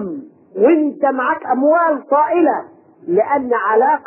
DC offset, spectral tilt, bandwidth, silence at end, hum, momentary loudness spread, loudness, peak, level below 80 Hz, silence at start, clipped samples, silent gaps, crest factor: under 0.1%; -11 dB/octave; 3.2 kHz; 0.05 s; none; 13 LU; -15 LUFS; -2 dBFS; -64 dBFS; 0 s; under 0.1%; none; 12 dB